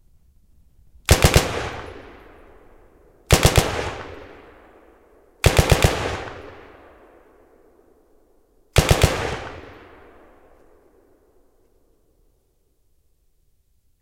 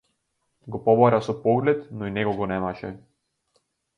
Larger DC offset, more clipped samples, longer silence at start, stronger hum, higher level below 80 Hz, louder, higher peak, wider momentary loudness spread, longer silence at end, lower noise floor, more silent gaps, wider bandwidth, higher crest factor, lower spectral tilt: neither; neither; first, 1.1 s vs 0.65 s; neither; first, -30 dBFS vs -56 dBFS; first, -19 LUFS vs -23 LUFS; first, 0 dBFS vs -4 dBFS; first, 26 LU vs 16 LU; first, 4.3 s vs 1 s; second, -64 dBFS vs -75 dBFS; neither; first, 16.5 kHz vs 7.2 kHz; about the same, 24 dB vs 20 dB; second, -4 dB/octave vs -8 dB/octave